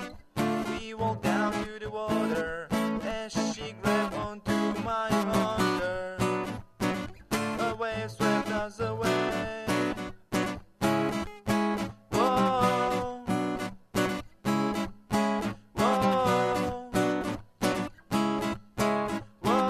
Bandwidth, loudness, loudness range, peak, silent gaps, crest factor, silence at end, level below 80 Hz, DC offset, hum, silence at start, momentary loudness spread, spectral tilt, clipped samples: 14 kHz; -29 LUFS; 2 LU; -12 dBFS; none; 18 dB; 0 s; -52 dBFS; under 0.1%; none; 0 s; 8 LU; -5.5 dB/octave; under 0.1%